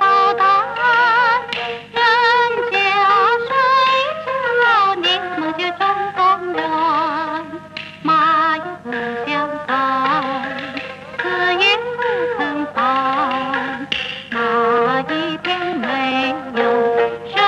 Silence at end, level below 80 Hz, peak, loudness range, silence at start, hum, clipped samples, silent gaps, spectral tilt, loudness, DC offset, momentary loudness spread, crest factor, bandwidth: 0 s; -58 dBFS; -2 dBFS; 4 LU; 0 s; 50 Hz at -45 dBFS; under 0.1%; none; -4 dB/octave; -17 LUFS; under 0.1%; 10 LU; 14 dB; 9.6 kHz